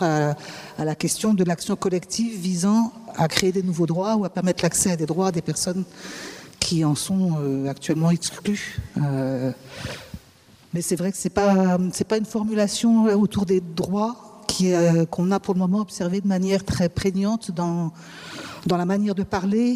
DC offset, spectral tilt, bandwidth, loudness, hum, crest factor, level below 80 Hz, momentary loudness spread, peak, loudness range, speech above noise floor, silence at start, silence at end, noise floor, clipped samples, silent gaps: under 0.1%; -5.5 dB/octave; 15.5 kHz; -23 LUFS; none; 22 dB; -52 dBFS; 12 LU; 0 dBFS; 4 LU; 30 dB; 0 s; 0 s; -52 dBFS; under 0.1%; none